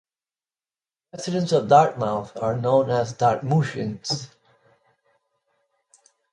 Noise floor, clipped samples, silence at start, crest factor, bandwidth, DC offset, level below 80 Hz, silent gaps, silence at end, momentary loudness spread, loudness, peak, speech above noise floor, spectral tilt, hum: under -90 dBFS; under 0.1%; 1.15 s; 22 dB; 11 kHz; under 0.1%; -62 dBFS; none; 2.05 s; 12 LU; -22 LUFS; -2 dBFS; over 69 dB; -6 dB/octave; none